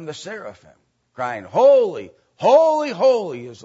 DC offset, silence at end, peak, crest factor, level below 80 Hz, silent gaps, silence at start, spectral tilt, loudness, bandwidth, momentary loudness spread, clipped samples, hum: under 0.1%; 0.1 s; -2 dBFS; 16 dB; -70 dBFS; none; 0 s; -5 dB/octave; -17 LUFS; 8 kHz; 19 LU; under 0.1%; none